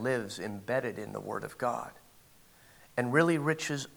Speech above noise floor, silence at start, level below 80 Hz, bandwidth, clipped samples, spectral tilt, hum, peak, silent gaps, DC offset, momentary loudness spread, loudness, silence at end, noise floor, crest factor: 28 dB; 0 s; -70 dBFS; over 20 kHz; under 0.1%; -5.5 dB/octave; none; -10 dBFS; none; under 0.1%; 12 LU; -32 LUFS; 0.05 s; -60 dBFS; 22 dB